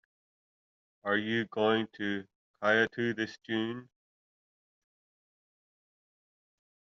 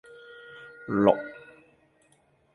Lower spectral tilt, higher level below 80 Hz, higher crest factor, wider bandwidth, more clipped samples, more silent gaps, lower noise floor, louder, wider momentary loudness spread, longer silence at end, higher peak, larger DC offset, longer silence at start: second, -3 dB/octave vs -8 dB/octave; second, -78 dBFS vs -64 dBFS; about the same, 24 dB vs 26 dB; second, 7.2 kHz vs 11 kHz; neither; first, 2.35-2.54 s vs none; first, under -90 dBFS vs -65 dBFS; second, -31 LUFS vs -25 LUFS; second, 11 LU vs 25 LU; first, 3 s vs 1.15 s; second, -12 dBFS vs -4 dBFS; neither; first, 1.05 s vs 0.5 s